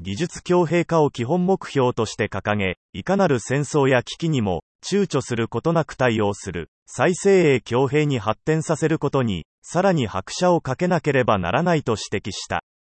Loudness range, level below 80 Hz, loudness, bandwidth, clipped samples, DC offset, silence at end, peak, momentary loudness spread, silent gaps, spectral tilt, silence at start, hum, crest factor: 1 LU; -52 dBFS; -21 LUFS; 8.8 kHz; under 0.1%; under 0.1%; 0.2 s; -4 dBFS; 8 LU; 2.77-2.93 s, 4.62-4.79 s, 6.68-6.86 s, 9.45-9.62 s; -6 dB/octave; 0 s; none; 16 dB